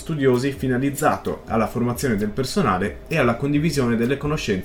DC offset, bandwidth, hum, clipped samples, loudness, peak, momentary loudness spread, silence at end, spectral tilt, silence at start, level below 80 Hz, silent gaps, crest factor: 0.2%; 17.5 kHz; none; under 0.1%; -22 LUFS; -4 dBFS; 4 LU; 0 s; -6 dB/octave; 0 s; -40 dBFS; none; 16 dB